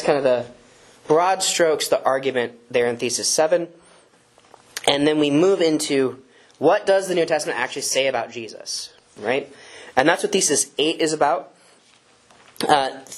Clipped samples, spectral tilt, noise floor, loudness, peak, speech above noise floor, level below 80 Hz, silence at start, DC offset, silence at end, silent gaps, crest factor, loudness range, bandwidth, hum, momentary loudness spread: under 0.1%; -2.5 dB/octave; -55 dBFS; -20 LUFS; 0 dBFS; 35 dB; -64 dBFS; 0 s; under 0.1%; 0 s; none; 22 dB; 3 LU; 13.5 kHz; none; 11 LU